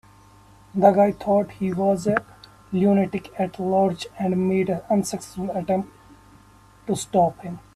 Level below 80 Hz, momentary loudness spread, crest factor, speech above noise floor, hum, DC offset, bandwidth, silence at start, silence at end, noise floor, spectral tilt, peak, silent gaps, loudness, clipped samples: -56 dBFS; 10 LU; 22 dB; 30 dB; none; under 0.1%; 13.5 kHz; 0.75 s; 0.15 s; -51 dBFS; -6.5 dB/octave; 0 dBFS; none; -23 LUFS; under 0.1%